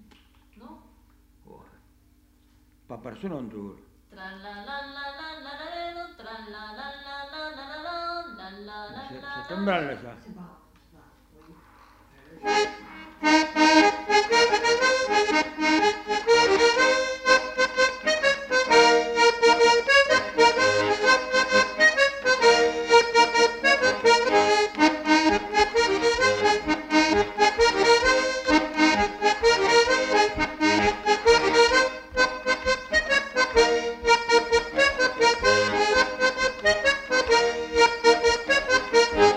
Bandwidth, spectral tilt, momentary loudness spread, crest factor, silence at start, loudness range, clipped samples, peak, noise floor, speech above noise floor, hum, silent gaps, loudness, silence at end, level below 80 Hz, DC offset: 11.5 kHz; -2.5 dB/octave; 19 LU; 16 dB; 0.7 s; 18 LU; under 0.1%; -6 dBFS; -59 dBFS; 34 dB; none; none; -21 LUFS; 0 s; -48 dBFS; under 0.1%